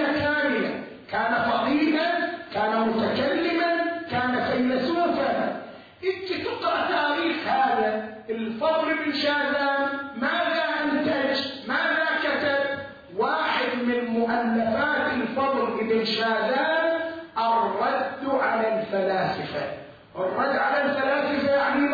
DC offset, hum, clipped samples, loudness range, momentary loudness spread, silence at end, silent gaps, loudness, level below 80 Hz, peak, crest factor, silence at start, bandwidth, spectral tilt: under 0.1%; none; under 0.1%; 2 LU; 7 LU; 0 s; none; -24 LUFS; -62 dBFS; -12 dBFS; 14 dB; 0 s; 5 kHz; -6 dB/octave